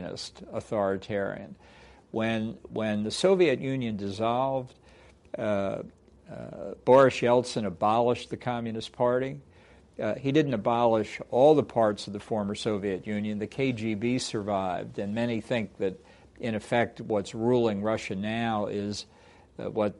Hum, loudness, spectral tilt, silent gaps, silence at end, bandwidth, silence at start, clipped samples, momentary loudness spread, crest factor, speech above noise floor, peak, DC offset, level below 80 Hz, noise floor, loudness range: none; -28 LUFS; -6 dB/octave; none; 0.05 s; 11.5 kHz; 0 s; under 0.1%; 15 LU; 20 dB; 28 dB; -8 dBFS; under 0.1%; -60 dBFS; -56 dBFS; 5 LU